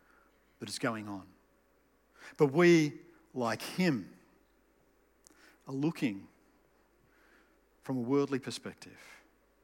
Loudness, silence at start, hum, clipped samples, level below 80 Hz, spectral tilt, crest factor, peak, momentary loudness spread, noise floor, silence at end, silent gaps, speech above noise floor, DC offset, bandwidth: -32 LUFS; 0.6 s; none; under 0.1%; -76 dBFS; -6 dB/octave; 22 dB; -14 dBFS; 26 LU; -70 dBFS; 0.5 s; none; 38 dB; under 0.1%; 17 kHz